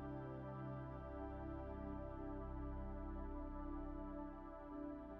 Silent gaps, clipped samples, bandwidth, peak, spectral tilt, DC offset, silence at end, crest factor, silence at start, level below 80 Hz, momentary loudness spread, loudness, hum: none; under 0.1%; 4.5 kHz; -36 dBFS; -9 dB/octave; under 0.1%; 0 s; 12 dB; 0 s; -54 dBFS; 2 LU; -51 LUFS; none